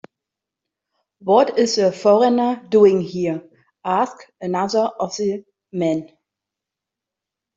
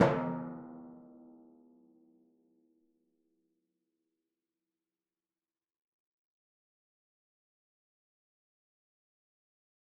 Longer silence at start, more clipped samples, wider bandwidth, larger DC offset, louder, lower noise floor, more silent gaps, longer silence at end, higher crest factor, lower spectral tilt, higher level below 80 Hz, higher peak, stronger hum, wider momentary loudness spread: first, 1.25 s vs 0 s; neither; first, 7.8 kHz vs 3.1 kHz; neither; first, -18 LUFS vs -36 LUFS; second, -85 dBFS vs under -90 dBFS; neither; second, 1.5 s vs 9 s; second, 18 dB vs 32 dB; about the same, -5.5 dB/octave vs -4.5 dB/octave; first, -66 dBFS vs -76 dBFS; first, -2 dBFS vs -10 dBFS; neither; second, 16 LU vs 25 LU